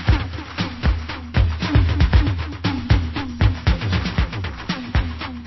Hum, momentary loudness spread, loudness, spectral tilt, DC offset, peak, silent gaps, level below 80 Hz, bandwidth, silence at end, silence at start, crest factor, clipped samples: none; 9 LU; -21 LUFS; -7 dB/octave; under 0.1%; -2 dBFS; none; -22 dBFS; 6 kHz; 0 s; 0 s; 16 dB; under 0.1%